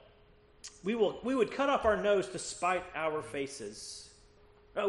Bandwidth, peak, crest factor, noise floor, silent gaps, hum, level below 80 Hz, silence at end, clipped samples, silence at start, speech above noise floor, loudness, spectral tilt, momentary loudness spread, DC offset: 11.5 kHz; -14 dBFS; 20 dB; -61 dBFS; none; none; -60 dBFS; 0 s; under 0.1%; 0.65 s; 29 dB; -33 LUFS; -4 dB/octave; 15 LU; under 0.1%